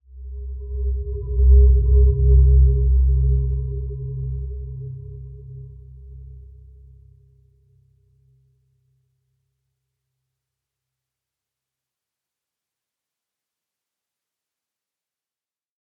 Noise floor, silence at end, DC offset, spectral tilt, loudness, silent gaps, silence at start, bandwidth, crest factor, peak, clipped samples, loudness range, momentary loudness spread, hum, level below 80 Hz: under -90 dBFS; 9.5 s; under 0.1%; -15.5 dB/octave; -19 LUFS; none; 0.15 s; 1 kHz; 18 dB; -4 dBFS; under 0.1%; 21 LU; 24 LU; none; -22 dBFS